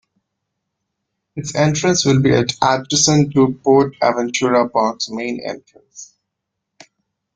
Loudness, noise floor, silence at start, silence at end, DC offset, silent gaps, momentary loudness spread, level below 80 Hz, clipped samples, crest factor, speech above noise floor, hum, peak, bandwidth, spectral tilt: -16 LUFS; -78 dBFS; 1.35 s; 1.3 s; under 0.1%; none; 12 LU; -52 dBFS; under 0.1%; 18 dB; 62 dB; none; 0 dBFS; 9.6 kHz; -4.5 dB/octave